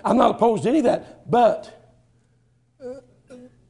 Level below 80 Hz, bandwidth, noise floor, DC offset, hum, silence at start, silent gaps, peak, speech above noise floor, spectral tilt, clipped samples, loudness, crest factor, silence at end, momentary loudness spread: -56 dBFS; 11 kHz; -62 dBFS; under 0.1%; none; 0.05 s; none; -2 dBFS; 43 dB; -6.5 dB/octave; under 0.1%; -20 LUFS; 20 dB; 0.35 s; 20 LU